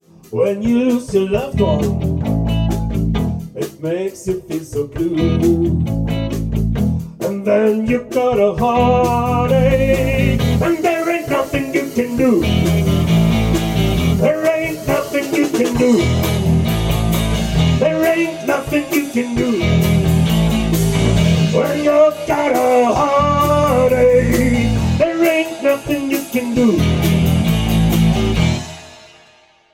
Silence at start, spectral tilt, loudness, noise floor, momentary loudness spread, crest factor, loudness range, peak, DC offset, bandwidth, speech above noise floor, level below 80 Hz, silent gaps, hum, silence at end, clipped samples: 0.3 s; -6.5 dB/octave; -16 LUFS; -50 dBFS; 6 LU; 14 dB; 5 LU; -2 dBFS; under 0.1%; 16.5 kHz; 35 dB; -28 dBFS; none; none; 0.75 s; under 0.1%